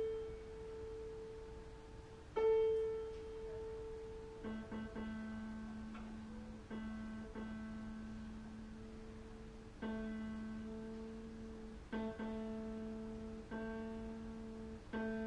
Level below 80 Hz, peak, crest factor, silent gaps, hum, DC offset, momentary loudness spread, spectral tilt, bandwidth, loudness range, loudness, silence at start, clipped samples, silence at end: -58 dBFS; -28 dBFS; 18 dB; none; none; under 0.1%; 10 LU; -7 dB/octave; 10.5 kHz; 8 LU; -46 LUFS; 0 s; under 0.1%; 0 s